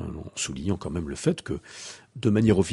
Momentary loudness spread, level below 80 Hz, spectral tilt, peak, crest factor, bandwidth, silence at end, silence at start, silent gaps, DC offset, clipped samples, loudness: 17 LU; -46 dBFS; -6 dB/octave; -6 dBFS; 20 dB; 11.5 kHz; 0 s; 0 s; none; under 0.1%; under 0.1%; -27 LUFS